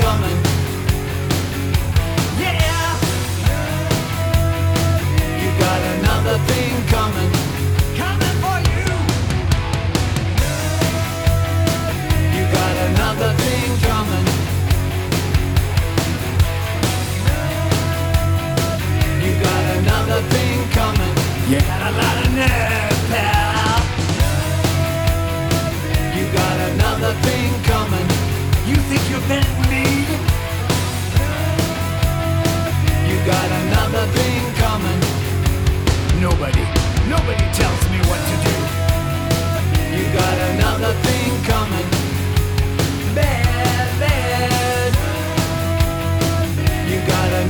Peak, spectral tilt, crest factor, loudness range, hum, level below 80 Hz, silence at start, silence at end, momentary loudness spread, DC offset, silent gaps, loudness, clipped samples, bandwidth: -4 dBFS; -5 dB/octave; 12 dB; 2 LU; none; -26 dBFS; 0 s; 0 s; 3 LU; under 0.1%; none; -18 LUFS; under 0.1%; over 20 kHz